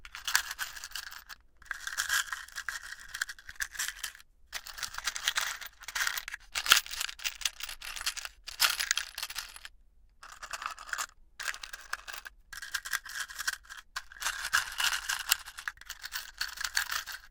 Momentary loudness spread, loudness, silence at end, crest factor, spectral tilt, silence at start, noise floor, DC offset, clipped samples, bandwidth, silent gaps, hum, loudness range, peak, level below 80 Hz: 14 LU; -33 LUFS; 0 s; 34 dB; 3 dB/octave; 0 s; -60 dBFS; under 0.1%; under 0.1%; 19 kHz; none; none; 8 LU; -2 dBFS; -60 dBFS